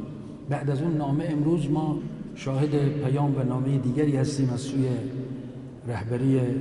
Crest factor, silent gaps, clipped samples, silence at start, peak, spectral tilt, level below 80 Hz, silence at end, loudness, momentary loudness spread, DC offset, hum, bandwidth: 14 dB; none; under 0.1%; 0 s; -12 dBFS; -8 dB/octave; -52 dBFS; 0 s; -26 LUFS; 12 LU; under 0.1%; none; 11.5 kHz